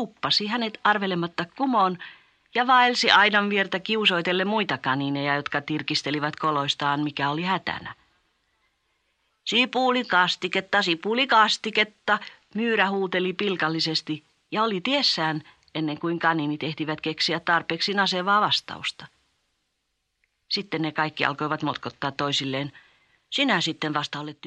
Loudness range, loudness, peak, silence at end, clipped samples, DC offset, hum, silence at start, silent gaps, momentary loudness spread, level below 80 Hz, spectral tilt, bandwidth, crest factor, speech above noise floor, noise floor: 7 LU; -24 LUFS; -2 dBFS; 0 s; under 0.1%; under 0.1%; none; 0 s; none; 11 LU; -70 dBFS; -4 dB/octave; 10 kHz; 22 dB; 52 dB; -76 dBFS